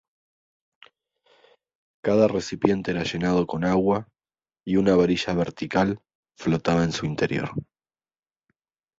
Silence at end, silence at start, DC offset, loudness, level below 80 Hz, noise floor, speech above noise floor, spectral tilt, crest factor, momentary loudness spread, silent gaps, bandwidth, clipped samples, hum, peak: 1.35 s; 2.05 s; under 0.1%; -24 LUFS; -52 dBFS; under -90 dBFS; over 67 dB; -6.5 dB/octave; 22 dB; 10 LU; 6.15-6.23 s; 7.8 kHz; under 0.1%; none; -4 dBFS